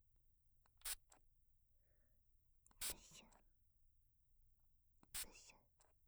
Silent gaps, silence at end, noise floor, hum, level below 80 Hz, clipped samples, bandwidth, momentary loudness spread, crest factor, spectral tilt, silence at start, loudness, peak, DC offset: none; 0 s; -77 dBFS; none; -72 dBFS; under 0.1%; over 20 kHz; 17 LU; 26 dB; 0.5 dB/octave; 0.15 s; -50 LUFS; -34 dBFS; under 0.1%